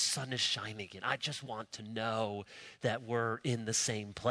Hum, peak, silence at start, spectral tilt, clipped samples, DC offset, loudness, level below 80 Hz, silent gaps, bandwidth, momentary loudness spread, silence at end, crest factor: none; -14 dBFS; 0 s; -3 dB/octave; under 0.1%; under 0.1%; -36 LUFS; -72 dBFS; none; 11 kHz; 11 LU; 0 s; 22 dB